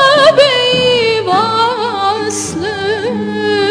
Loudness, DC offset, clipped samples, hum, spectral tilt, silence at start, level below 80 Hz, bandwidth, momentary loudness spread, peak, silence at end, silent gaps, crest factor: -12 LUFS; under 0.1%; under 0.1%; none; -3 dB/octave; 0 s; -48 dBFS; 13.5 kHz; 10 LU; 0 dBFS; 0 s; none; 12 dB